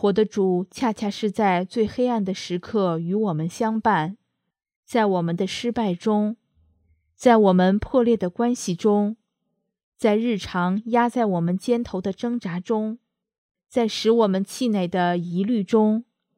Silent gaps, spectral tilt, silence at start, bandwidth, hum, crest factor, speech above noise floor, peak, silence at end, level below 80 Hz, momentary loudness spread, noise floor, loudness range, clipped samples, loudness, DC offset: 4.76-4.83 s, 9.83-9.92 s, 13.38-13.49 s; -6.5 dB/octave; 0 s; 14 kHz; none; 20 dB; 55 dB; -2 dBFS; 0.35 s; -56 dBFS; 7 LU; -77 dBFS; 3 LU; under 0.1%; -22 LUFS; under 0.1%